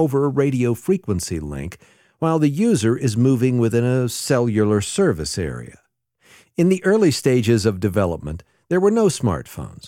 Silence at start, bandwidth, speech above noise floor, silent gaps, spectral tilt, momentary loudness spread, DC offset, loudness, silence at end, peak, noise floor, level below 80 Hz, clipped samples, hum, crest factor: 0 s; 16.5 kHz; 38 dB; none; -6 dB/octave; 12 LU; under 0.1%; -19 LUFS; 0 s; -4 dBFS; -57 dBFS; -44 dBFS; under 0.1%; none; 14 dB